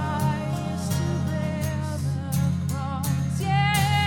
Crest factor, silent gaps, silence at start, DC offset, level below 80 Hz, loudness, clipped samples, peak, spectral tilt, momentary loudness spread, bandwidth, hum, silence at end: 16 dB; none; 0 s; under 0.1%; -42 dBFS; -26 LUFS; under 0.1%; -8 dBFS; -5.5 dB/octave; 7 LU; 18 kHz; none; 0 s